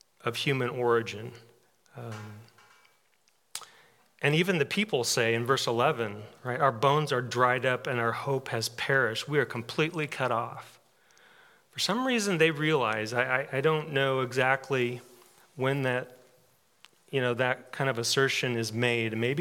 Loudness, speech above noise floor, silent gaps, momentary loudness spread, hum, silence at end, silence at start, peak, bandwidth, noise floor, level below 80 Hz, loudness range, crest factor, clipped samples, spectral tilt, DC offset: -28 LUFS; 42 dB; none; 15 LU; none; 0 s; 0.25 s; -10 dBFS; 18 kHz; -70 dBFS; -80 dBFS; 6 LU; 20 dB; under 0.1%; -4.5 dB/octave; under 0.1%